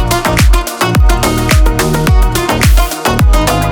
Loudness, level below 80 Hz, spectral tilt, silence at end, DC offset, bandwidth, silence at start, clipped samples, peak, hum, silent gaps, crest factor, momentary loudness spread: -11 LUFS; -12 dBFS; -5 dB/octave; 0 s; under 0.1%; 19 kHz; 0 s; under 0.1%; 0 dBFS; none; none; 8 dB; 2 LU